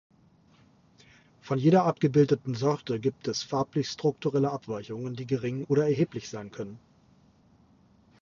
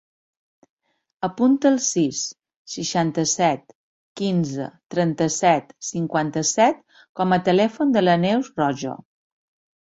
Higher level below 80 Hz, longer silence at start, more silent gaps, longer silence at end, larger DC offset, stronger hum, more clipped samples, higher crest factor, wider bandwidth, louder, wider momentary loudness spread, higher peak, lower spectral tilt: about the same, -66 dBFS vs -64 dBFS; first, 1.45 s vs 1.2 s; second, none vs 2.56-2.65 s, 3.75-4.15 s, 4.86-4.90 s, 7.09-7.15 s; first, 1.45 s vs 0.95 s; neither; neither; neither; about the same, 20 dB vs 18 dB; second, 7.4 kHz vs 8.2 kHz; second, -28 LUFS vs -21 LUFS; about the same, 14 LU vs 12 LU; second, -10 dBFS vs -4 dBFS; first, -7 dB/octave vs -4.5 dB/octave